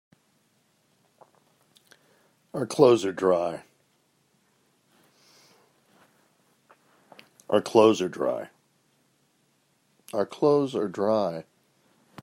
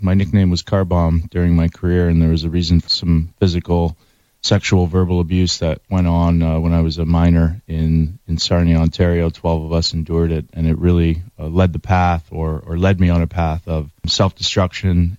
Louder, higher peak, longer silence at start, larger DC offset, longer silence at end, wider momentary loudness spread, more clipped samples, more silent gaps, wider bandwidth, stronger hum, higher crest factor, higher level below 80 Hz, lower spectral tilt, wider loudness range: second, -24 LUFS vs -17 LUFS; about the same, -4 dBFS vs -4 dBFS; first, 2.55 s vs 0 s; neither; first, 0.8 s vs 0 s; first, 16 LU vs 6 LU; neither; neither; first, 15 kHz vs 7.8 kHz; neither; first, 24 dB vs 12 dB; second, -76 dBFS vs -26 dBFS; about the same, -6 dB/octave vs -6.5 dB/octave; about the same, 3 LU vs 2 LU